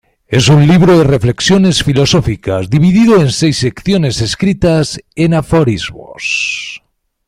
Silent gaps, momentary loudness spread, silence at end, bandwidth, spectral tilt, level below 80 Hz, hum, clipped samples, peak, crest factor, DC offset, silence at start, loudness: none; 10 LU; 0.5 s; 13 kHz; -5.5 dB/octave; -34 dBFS; none; under 0.1%; 0 dBFS; 10 dB; under 0.1%; 0.3 s; -11 LUFS